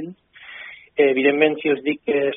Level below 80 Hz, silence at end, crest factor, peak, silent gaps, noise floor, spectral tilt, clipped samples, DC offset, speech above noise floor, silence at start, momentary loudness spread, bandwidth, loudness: -68 dBFS; 0 s; 18 dB; -2 dBFS; none; -42 dBFS; -3 dB/octave; under 0.1%; under 0.1%; 23 dB; 0 s; 20 LU; 3.8 kHz; -19 LUFS